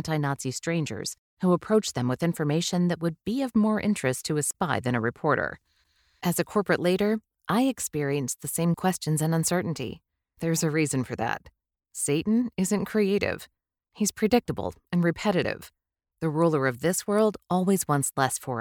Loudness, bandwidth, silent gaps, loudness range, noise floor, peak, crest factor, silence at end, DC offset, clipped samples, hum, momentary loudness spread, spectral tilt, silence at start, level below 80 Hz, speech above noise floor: -26 LUFS; 19.5 kHz; 1.18-1.37 s; 2 LU; -67 dBFS; -8 dBFS; 18 dB; 0 s; under 0.1%; under 0.1%; none; 8 LU; -5 dB/octave; 0 s; -58 dBFS; 41 dB